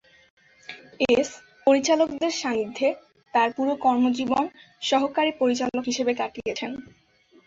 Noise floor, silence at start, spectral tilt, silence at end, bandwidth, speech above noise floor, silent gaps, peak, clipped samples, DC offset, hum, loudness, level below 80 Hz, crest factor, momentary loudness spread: -45 dBFS; 0.7 s; -3 dB/octave; 0.6 s; 7.8 kHz; 22 dB; none; -8 dBFS; under 0.1%; under 0.1%; none; -24 LUFS; -62 dBFS; 16 dB; 11 LU